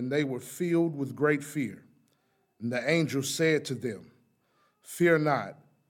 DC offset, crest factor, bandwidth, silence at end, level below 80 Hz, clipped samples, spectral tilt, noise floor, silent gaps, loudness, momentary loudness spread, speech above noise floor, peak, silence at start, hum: under 0.1%; 18 dB; 17.5 kHz; 0.35 s; -78 dBFS; under 0.1%; -5.5 dB/octave; -72 dBFS; none; -29 LUFS; 12 LU; 44 dB; -12 dBFS; 0 s; none